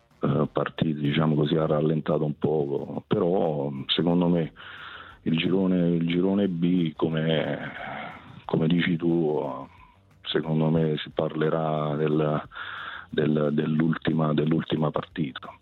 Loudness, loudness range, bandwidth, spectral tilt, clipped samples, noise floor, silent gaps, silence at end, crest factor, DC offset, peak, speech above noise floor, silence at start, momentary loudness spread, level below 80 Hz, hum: -26 LUFS; 2 LU; 4.3 kHz; -9.5 dB/octave; under 0.1%; -54 dBFS; none; 0.05 s; 18 dB; under 0.1%; -8 dBFS; 29 dB; 0.2 s; 11 LU; -58 dBFS; none